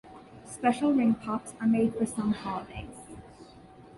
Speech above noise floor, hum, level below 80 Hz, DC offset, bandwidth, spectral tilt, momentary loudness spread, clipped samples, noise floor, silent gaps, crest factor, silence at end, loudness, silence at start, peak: 24 dB; none; -56 dBFS; under 0.1%; 11.5 kHz; -6 dB/octave; 22 LU; under 0.1%; -51 dBFS; none; 20 dB; 0 s; -28 LUFS; 0.05 s; -10 dBFS